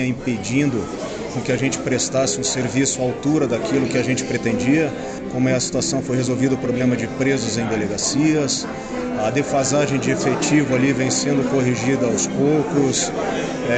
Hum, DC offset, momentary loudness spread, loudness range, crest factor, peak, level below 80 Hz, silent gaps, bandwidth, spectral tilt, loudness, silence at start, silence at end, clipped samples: none; under 0.1%; 5 LU; 2 LU; 14 dB; -6 dBFS; -48 dBFS; none; 9.2 kHz; -4.5 dB/octave; -20 LUFS; 0 s; 0 s; under 0.1%